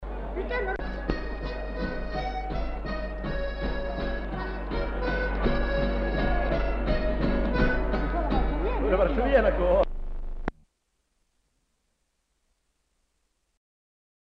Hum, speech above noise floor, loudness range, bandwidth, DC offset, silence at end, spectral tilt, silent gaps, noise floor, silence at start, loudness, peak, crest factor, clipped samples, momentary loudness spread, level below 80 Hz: none; 51 dB; 7 LU; 6 kHz; under 0.1%; 3.9 s; -8.5 dB/octave; none; -75 dBFS; 0 s; -29 LUFS; -10 dBFS; 18 dB; under 0.1%; 10 LU; -32 dBFS